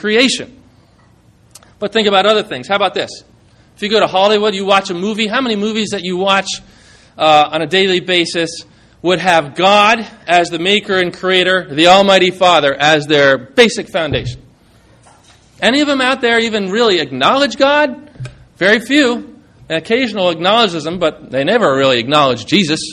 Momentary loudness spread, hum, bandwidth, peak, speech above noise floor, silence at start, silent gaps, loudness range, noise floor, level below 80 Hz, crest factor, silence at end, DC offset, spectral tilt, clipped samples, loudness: 10 LU; none; 13 kHz; 0 dBFS; 35 dB; 0.05 s; none; 4 LU; -48 dBFS; -48 dBFS; 14 dB; 0 s; under 0.1%; -4 dB/octave; 0.1%; -12 LUFS